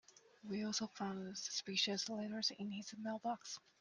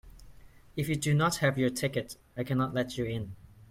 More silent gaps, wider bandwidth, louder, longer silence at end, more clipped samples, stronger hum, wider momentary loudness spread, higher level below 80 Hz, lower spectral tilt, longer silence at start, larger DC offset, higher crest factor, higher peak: neither; second, 10.5 kHz vs 16.5 kHz; second, -42 LUFS vs -30 LUFS; first, 0.2 s vs 0.05 s; neither; neither; second, 10 LU vs 15 LU; second, -86 dBFS vs -56 dBFS; second, -3 dB/octave vs -5.5 dB/octave; about the same, 0.1 s vs 0.05 s; neither; about the same, 22 dB vs 18 dB; second, -22 dBFS vs -14 dBFS